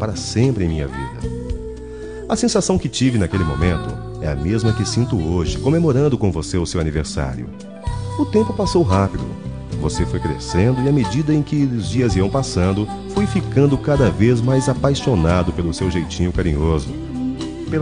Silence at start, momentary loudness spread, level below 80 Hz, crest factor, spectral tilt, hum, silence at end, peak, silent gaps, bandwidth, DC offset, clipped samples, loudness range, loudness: 0 s; 11 LU; -32 dBFS; 16 dB; -6.5 dB/octave; none; 0 s; -2 dBFS; none; 10 kHz; 0.4%; under 0.1%; 3 LU; -19 LUFS